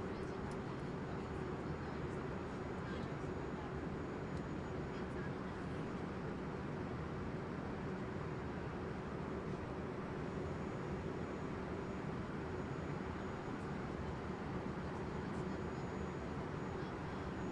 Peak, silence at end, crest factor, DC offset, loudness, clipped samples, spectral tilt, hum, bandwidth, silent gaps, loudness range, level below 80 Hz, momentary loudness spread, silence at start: -30 dBFS; 0 s; 14 dB; under 0.1%; -44 LUFS; under 0.1%; -7.5 dB/octave; none; 11 kHz; none; 0 LU; -56 dBFS; 1 LU; 0 s